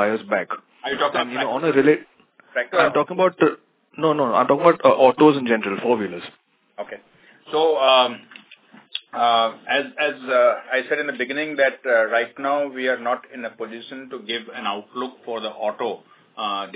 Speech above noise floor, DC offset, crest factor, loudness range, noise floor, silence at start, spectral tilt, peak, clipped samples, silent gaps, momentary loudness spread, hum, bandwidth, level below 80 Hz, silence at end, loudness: 29 dB; under 0.1%; 20 dB; 8 LU; -49 dBFS; 0 s; -8.5 dB/octave; 0 dBFS; under 0.1%; none; 17 LU; none; 4 kHz; -72 dBFS; 0.05 s; -20 LUFS